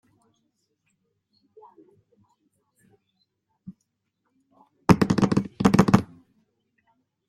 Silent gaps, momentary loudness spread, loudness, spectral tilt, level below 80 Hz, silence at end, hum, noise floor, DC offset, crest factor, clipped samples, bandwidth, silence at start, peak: none; 8 LU; -21 LUFS; -7 dB/octave; -50 dBFS; 1.25 s; none; -77 dBFS; under 0.1%; 26 dB; under 0.1%; 14.5 kHz; 3.7 s; -2 dBFS